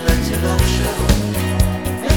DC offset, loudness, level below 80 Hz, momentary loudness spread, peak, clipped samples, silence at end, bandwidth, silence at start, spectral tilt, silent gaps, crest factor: 0.8%; -18 LUFS; -20 dBFS; 3 LU; 0 dBFS; under 0.1%; 0 s; 19 kHz; 0 s; -5 dB/octave; none; 16 dB